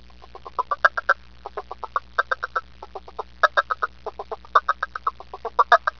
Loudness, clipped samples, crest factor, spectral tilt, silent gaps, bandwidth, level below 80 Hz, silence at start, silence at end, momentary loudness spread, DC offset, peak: -23 LUFS; under 0.1%; 24 dB; -2.5 dB/octave; none; 5.4 kHz; -52 dBFS; 0.45 s; 0.1 s; 17 LU; 0.4%; 0 dBFS